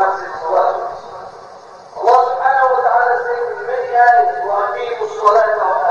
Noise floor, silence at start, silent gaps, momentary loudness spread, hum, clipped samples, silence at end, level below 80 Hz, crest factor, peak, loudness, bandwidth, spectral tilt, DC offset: -37 dBFS; 0 s; none; 14 LU; none; under 0.1%; 0 s; -64 dBFS; 14 dB; 0 dBFS; -15 LUFS; 7.2 kHz; -3.5 dB/octave; under 0.1%